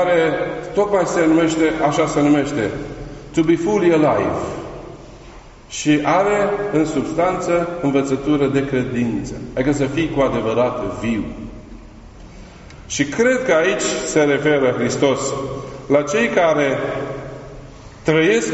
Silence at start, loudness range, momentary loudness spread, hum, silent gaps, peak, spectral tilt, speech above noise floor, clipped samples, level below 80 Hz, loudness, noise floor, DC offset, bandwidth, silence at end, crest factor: 0 s; 4 LU; 15 LU; none; none; -2 dBFS; -5 dB/octave; 23 dB; under 0.1%; -42 dBFS; -18 LUFS; -40 dBFS; under 0.1%; 8 kHz; 0 s; 16 dB